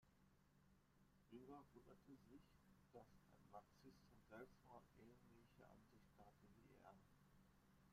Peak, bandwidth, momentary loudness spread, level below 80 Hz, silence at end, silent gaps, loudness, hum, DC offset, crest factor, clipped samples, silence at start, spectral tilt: -48 dBFS; 14.5 kHz; 6 LU; -82 dBFS; 0 s; none; -67 LUFS; none; under 0.1%; 22 dB; under 0.1%; 0 s; -6.5 dB/octave